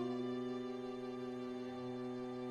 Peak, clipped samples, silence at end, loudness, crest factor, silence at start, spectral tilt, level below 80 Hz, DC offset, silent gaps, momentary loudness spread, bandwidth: -30 dBFS; under 0.1%; 0 s; -44 LUFS; 12 dB; 0 s; -7 dB/octave; -76 dBFS; under 0.1%; none; 4 LU; 9.4 kHz